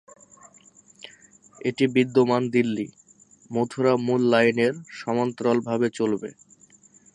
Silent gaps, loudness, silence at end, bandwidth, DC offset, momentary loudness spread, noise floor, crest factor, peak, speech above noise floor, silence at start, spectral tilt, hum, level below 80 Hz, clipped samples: none; -23 LUFS; 0.85 s; 10.5 kHz; under 0.1%; 16 LU; -55 dBFS; 20 dB; -6 dBFS; 33 dB; 1.65 s; -6 dB/octave; none; -70 dBFS; under 0.1%